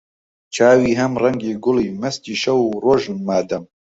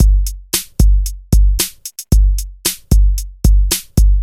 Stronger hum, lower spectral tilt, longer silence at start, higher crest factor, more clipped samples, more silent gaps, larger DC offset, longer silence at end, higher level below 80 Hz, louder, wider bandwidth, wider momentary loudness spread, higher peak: neither; first, -5.5 dB/octave vs -4 dB/octave; first, 0.5 s vs 0 s; about the same, 16 dB vs 12 dB; neither; neither; neither; first, 0.3 s vs 0 s; second, -52 dBFS vs -12 dBFS; about the same, -18 LUFS vs -16 LUFS; second, 8 kHz vs 16 kHz; first, 11 LU vs 5 LU; about the same, -2 dBFS vs 0 dBFS